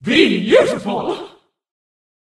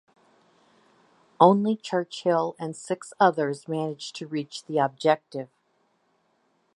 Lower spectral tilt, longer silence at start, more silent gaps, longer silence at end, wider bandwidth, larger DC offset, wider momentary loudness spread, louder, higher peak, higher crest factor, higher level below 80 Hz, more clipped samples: about the same, -5 dB/octave vs -6 dB/octave; second, 0 s vs 1.4 s; neither; second, 0.95 s vs 1.3 s; about the same, 12 kHz vs 11 kHz; neither; second, 12 LU vs 16 LU; first, -15 LUFS vs -25 LUFS; about the same, 0 dBFS vs -2 dBFS; second, 18 dB vs 24 dB; first, -54 dBFS vs -80 dBFS; neither